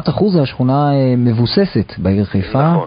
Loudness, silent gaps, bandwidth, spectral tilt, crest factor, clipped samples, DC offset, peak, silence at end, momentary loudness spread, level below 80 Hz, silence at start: -14 LUFS; none; 5.2 kHz; -13 dB/octave; 12 dB; under 0.1%; under 0.1%; 0 dBFS; 0 s; 4 LU; -36 dBFS; 0 s